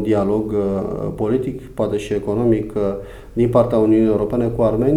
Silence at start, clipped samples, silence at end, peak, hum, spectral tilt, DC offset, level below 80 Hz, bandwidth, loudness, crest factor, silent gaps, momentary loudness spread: 0 s; under 0.1%; 0 s; -2 dBFS; none; -9 dB/octave; under 0.1%; -38 dBFS; 12 kHz; -19 LUFS; 16 dB; none; 9 LU